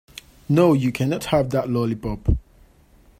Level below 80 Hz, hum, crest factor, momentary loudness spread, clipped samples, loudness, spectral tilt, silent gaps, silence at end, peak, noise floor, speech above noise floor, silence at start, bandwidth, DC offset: -34 dBFS; none; 18 dB; 10 LU; under 0.1%; -21 LUFS; -7.5 dB/octave; none; 0.8 s; -4 dBFS; -53 dBFS; 33 dB; 0.5 s; 16 kHz; under 0.1%